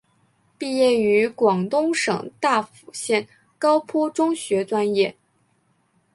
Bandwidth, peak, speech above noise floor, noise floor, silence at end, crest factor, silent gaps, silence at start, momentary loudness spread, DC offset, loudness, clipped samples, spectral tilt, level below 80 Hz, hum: 11.5 kHz; -4 dBFS; 45 dB; -65 dBFS; 1.05 s; 18 dB; none; 0.6 s; 6 LU; under 0.1%; -21 LUFS; under 0.1%; -4.5 dB/octave; -68 dBFS; none